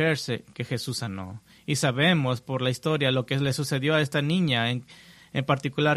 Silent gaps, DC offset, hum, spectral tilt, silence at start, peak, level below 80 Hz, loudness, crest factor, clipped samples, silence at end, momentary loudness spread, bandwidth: none; under 0.1%; none; -5 dB/octave; 0 s; -8 dBFS; -60 dBFS; -26 LUFS; 18 dB; under 0.1%; 0 s; 11 LU; 14 kHz